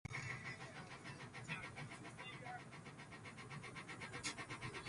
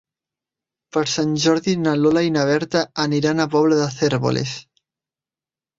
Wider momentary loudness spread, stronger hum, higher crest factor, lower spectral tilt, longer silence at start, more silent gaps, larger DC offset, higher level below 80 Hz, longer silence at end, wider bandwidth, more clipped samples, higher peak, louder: about the same, 8 LU vs 6 LU; neither; about the same, 20 dB vs 16 dB; second, -3.5 dB/octave vs -5 dB/octave; second, 0.05 s vs 0.95 s; neither; neither; second, -72 dBFS vs -58 dBFS; second, 0 s vs 1.15 s; first, 11.5 kHz vs 7.8 kHz; neither; second, -30 dBFS vs -4 dBFS; second, -50 LUFS vs -19 LUFS